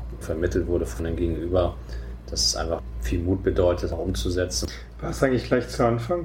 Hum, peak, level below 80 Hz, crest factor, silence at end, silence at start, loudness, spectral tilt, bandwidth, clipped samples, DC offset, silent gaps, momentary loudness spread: none; -6 dBFS; -34 dBFS; 18 dB; 0 s; 0 s; -25 LUFS; -5 dB/octave; 16.5 kHz; under 0.1%; under 0.1%; none; 10 LU